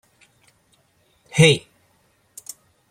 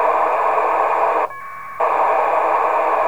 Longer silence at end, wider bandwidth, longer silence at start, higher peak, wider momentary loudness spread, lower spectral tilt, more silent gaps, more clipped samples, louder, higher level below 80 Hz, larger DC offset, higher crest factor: first, 1.3 s vs 0 s; second, 15 kHz vs over 20 kHz; first, 1.35 s vs 0 s; first, -2 dBFS vs -6 dBFS; first, 24 LU vs 7 LU; about the same, -4.5 dB/octave vs -4 dB/octave; neither; neither; about the same, -17 LUFS vs -17 LUFS; about the same, -58 dBFS vs -62 dBFS; second, under 0.1% vs 1%; first, 24 dB vs 12 dB